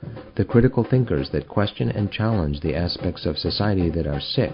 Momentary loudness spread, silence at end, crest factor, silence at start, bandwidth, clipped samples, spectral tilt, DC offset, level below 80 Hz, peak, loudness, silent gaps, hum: 7 LU; 0 s; 18 dB; 0 s; 5.4 kHz; under 0.1%; -11.5 dB/octave; under 0.1%; -36 dBFS; -4 dBFS; -23 LUFS; none; none